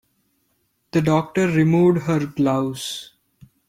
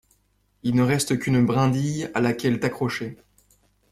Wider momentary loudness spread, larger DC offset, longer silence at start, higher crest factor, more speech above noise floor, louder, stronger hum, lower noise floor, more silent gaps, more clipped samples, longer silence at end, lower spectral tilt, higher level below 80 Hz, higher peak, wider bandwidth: first, 12 LU vs 8 LU; neither; first, 0.95 s vs 0.65 s; about the same, 16 dB vs 16 dB; first, 49 dB vs 44 dB; first, -20 LUFS vs -23 LUFS; second, none vs 50 Hz at -55 dBFS; about the same, -68 dBFS vs -66 dBFS; neither; neither; second, 0.65 s vs 0.8 s; about the same, -6.5 dB/octave vs -6 dB/octave; about the same, -56 dBFS vs -54 dBFS; first, -4 dBFS vs -8 dBFS; about the same, 15.5 kHz vs 14.5 kHz